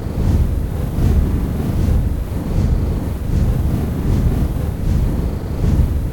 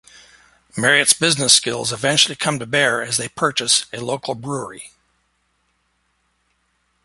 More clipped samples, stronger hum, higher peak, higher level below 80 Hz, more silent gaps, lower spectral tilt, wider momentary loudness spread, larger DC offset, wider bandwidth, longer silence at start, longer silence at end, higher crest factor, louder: neither; neither; about the same, -2 dBFS vs 0 dBFS; first, -20 dBFS vs -60 dBFS; neither; first, -8.5 dB/octave vs -1.5 dB/octave; second, 5 LU vs 14 LU; first, 0.4% vs under 0.1%; about the same, 17.5 kHz vs 16 kHz; second, 0 s vs 0.75 s; second, 0 s vs 2.2 s; second, 14 dB vs 22 dB; about the same, -19 LUFS vs -17 LUFS